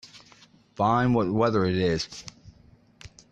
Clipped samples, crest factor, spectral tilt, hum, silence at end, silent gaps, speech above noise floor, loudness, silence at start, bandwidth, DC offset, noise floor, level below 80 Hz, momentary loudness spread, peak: under 0.1%; 18 dB; -6.5 dB/octave; none; 0.25 s; none; 33 dB; -24 LUFS; 0.05 s; 9.4 kHz; under 0.1%; -56 dBFS; -54 dBFS; 15 LU; -10 dBFS